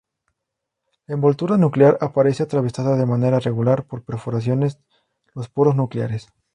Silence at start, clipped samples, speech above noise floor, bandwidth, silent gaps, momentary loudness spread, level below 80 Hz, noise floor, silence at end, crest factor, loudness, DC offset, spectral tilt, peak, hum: 1.1 s; under 0.1%; 62 dB; 10 kHz; none; 14 LU; -58 dBFS; -81 dBFS; 0.3 s; 18 dB; -19 LUFS; under 0.1%; -9 dB/octave; -2 dBFS; none